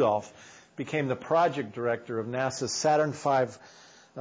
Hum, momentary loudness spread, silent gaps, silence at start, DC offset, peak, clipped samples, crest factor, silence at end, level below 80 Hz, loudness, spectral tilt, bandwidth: none; 18 LU; none; 0 s; under 0.1%; -14 dBFS; under 0.1%; 16 dB; 0 s; -68 dBFS; -28 LUFS; -4.5 dB/octave; 8 kHz